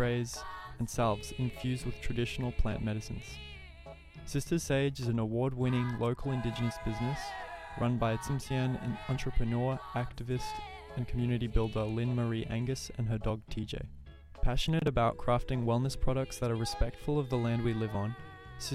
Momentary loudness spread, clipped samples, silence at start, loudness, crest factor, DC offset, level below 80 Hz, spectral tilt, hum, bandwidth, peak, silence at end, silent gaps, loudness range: 12 LU; under 0.1%; 0 s; -34 LUFS; 18 dB; under 0.1%; -40 dBFS; -6 dB/octave; none; 14.5 kHz; -16 dBFS; 0 s; none; 3 LU